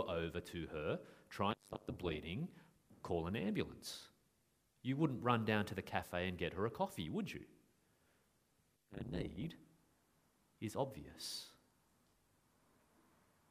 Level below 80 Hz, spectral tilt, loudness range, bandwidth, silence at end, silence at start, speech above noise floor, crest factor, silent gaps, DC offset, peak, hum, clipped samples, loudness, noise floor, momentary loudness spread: -64 dBFS; -6 dB/octave; 9 LU; 15.5 kHz; 2 s; 0 s; 37 dB; 24 dB; none; under 0.1%; -20 dBFS; none; under 0.1%; -43 LUFS; -79 dBFS; 12 LU